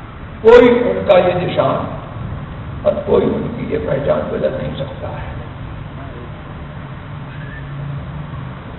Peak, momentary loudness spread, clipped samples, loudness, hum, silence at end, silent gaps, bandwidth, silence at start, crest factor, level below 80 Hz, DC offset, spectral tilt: 0 dBFS; 18 LU; under 0.1%; -15 LUFS; none; 0 s; none; 7.2 kHz; 0 s; 16 dB; -36 dBFS; under 0.1%; -8.5 dB/octave